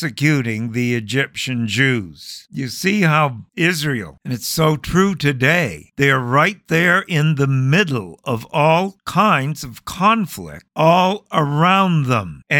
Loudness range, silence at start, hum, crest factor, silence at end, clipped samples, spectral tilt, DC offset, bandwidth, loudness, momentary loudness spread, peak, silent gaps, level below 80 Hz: 3 LU; 0 s; none; 16 dB; 0 s; under 0.1%; -5.5 dB/octave; under 0.1%; 18.5 kHz; -17 LUFS; 11 LU; -2 dBFS; none; -48 dBFS